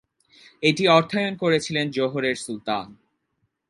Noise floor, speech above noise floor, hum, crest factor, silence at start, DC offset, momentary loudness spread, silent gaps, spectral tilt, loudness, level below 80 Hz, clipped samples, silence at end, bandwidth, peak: -74 dBFS; 52 dB; none; 22 dB; 0.6 s; under 0.1%; 11 LU; none; -5 dB/octave; -22 LUFS; -66 dBFS; under 0.1%; 0.75 s; 11.5 kHz; -2 dBFS